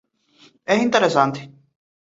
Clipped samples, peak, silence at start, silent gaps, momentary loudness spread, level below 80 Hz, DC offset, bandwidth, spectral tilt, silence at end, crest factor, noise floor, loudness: under 0.1%; -2 dBFS; 0.7 s; none; 18 LU; -66 dBFS; under 0.1%; 8 kHz; -5 dB/octave; 0.7 s; 20 dB; -55 dBFS; -18 LUFS